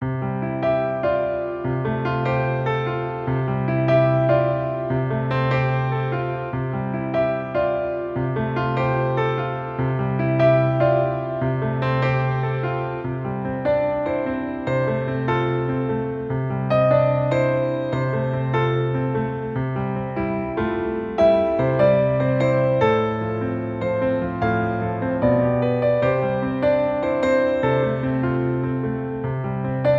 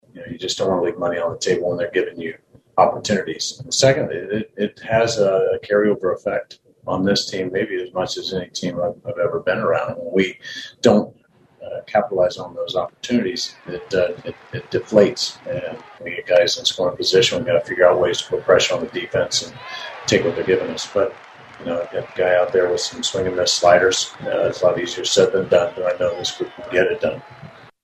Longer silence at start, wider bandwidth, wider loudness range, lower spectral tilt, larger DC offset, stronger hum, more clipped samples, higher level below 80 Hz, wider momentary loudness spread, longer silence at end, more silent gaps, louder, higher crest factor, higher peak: second, 0 s vs 0.15 s; second, 7 kHz vs 13 kHz; about the same, 3 LU vs 5 LU; first, -9 dB/octave vs -3.5 dB/octave; neither; neither; neither; first, -46 dBFS vs -56 dBFS; second, 8 LU vs 12 LU; second, 0 s vs 0.3 s; neither; second, -22 LUFS vs -19 LUFS; about the same, 16 dB vs 20 dB; second, -6 dBFS vs 0 dBFS